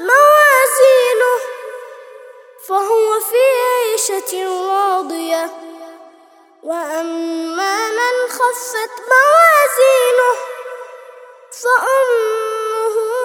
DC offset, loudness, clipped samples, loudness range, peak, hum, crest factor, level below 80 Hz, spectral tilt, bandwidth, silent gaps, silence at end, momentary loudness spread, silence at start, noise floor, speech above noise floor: under 0.1%; -14 LUFS; under 0.1%; 8 LU; 0 dBFS; none; 14 dB; -78 dBFS; 1 dB/octave; 19.5 kHz; none; 0 s; 20 LU; 0 s; -47 dBFS; 33 dB